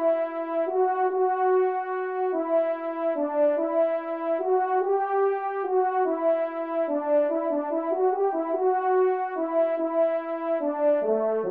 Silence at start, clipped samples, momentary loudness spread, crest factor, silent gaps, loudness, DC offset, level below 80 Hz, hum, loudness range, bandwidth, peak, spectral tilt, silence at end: 0 s; under 0.1%; 5 LU; 12 dB; none; -25 LUFS; under 0.1%; -80 dBFS; none; 1 LU; 3.9 kHz; -14 dBFS; -9 dB/octave; 0 s